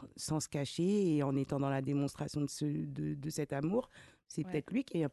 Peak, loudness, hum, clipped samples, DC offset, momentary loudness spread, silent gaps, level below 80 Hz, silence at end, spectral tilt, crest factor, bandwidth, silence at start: -22 dBFS; -36 LUFS; none; under 0.1%; under 0.1%; 7 LU; none; -66 dBFS; 0 s; -6 dB/octave; 12 dB; 12.5 kHz; 0 s